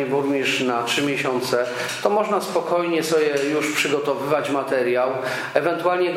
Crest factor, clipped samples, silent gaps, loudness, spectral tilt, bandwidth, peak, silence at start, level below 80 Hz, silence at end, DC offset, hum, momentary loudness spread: 18 dB; under 0.1%; none; -21 LUFS; -4 dB/octave; 16 kHz; -2 dBFS; 0 s; -70 dBFS; 0 s; under 0.1%; none; 3 LU